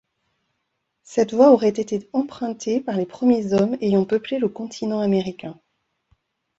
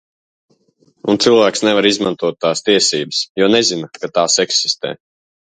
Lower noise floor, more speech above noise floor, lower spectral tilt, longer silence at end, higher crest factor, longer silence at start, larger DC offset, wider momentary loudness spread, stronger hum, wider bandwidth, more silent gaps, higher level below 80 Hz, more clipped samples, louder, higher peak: first, -76 dBFS vs -57 dBFS; first, 56 dB vs 42 dB; first, -6.5 dB/octave vs -2.5 dB/octave; first, 1.05 s vs 0.65 s; about the same, 20 dB vs 16 dB; about the same, 1.1 s vs 1.05 s; neither; first, 13 LU vs 9 LU; neither; second, 8 kHz vs 9.6 kHz; second, none vs 3.30-3.35 s; about the same, -62 dBFS vs -60 dBFS; neither; second, -21 LUFS vs -14 LUFS; about the same, -2 dBFS vs 0 dBFS